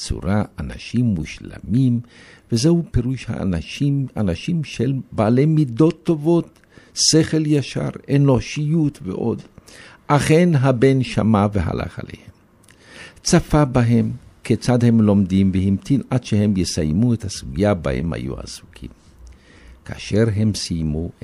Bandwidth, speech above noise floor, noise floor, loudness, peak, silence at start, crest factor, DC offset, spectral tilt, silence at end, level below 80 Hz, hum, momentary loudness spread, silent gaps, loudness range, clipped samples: 12.5 kHz; 33 dB; -51 dBFS; -19 LUFS; -2 dBFS; 0 s; 18 dB; under 0.1%; -6 dB/octave; 0.1 s; -38 dBFS; none; 14 LU; none; 4 LU; under 0.1%